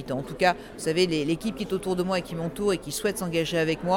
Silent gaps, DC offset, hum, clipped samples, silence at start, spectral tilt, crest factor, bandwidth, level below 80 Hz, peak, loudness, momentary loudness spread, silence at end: none; under 0.1%; none; under 0.1%; 0 s; -5 dB/octave; 18 dB; 18.5 kHz; -50 dBFS; -8 dBFS; -27 LUFS; 6 LU; 0 s